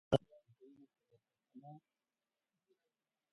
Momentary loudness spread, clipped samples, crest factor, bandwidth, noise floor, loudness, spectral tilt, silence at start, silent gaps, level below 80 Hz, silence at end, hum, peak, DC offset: 27 LU; under 0.1%; 32 dB; 4.8 kHz; under -90 dBFS; -38 LUFS; -6.5 dB/octave; 0.1 s; none; -68 dBFS; 1.6 s; none; -14 dBFS; under 0.1%